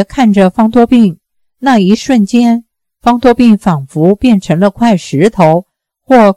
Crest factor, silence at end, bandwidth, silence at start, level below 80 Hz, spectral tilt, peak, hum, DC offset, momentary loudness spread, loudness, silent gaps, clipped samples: 8 dB; 0.05 s; 12 kHz; 0 s; -38 dBFS; -7 dB/octave; 0 dBFS; none; 0.3%; 5 LU; -9 LUFS; none; 2%